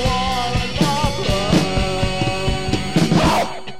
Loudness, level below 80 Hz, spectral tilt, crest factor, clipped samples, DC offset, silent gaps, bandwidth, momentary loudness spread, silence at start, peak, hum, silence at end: -19 LUFS; -28 dBFS; -5 dB/octave; 14 dB; under 0.1%; 3%; none; 16 kHz; 5 LU; 0 s; -4 dBFS; none; 0 s